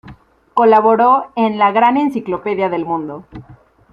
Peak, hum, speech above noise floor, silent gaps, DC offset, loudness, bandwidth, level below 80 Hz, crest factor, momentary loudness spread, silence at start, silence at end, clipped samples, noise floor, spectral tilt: -2 dBFS; none; 27 dB; none; under 0.1%; -14 LUFS; 6.6 kHz; -54 dBFS; 14 dB; 11 LU; 0.05 s; 0.4 s; under 0.1%; -41 dBFS; -7.5 dB/octave